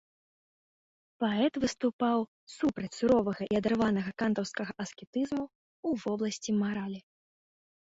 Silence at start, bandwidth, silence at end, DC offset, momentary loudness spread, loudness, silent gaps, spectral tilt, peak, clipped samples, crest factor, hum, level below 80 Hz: 1.2 s; 8 kHz; 0.85 s; under 0.1%; 10 LU; -31 LUFS; 1.93-1.99 s, 2.28-2.47 s, 5.07-5.13 s, 5.55-5.83 s; -5.5 dB/octave; -14 dBFS; under 0.1%; 18 dB; none; -64 dBFS